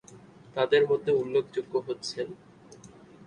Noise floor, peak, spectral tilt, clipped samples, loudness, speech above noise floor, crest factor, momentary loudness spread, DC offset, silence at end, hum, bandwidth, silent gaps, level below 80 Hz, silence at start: -51 dBFS; -10 dBFS; -5 dB/octave; under 0.1%; -28 LUFS; 24 dB; 18 dB; 15 LU; under 0.1%; 0.4 s; none; 10 kHz; none; -70 dBFS; 0.1 s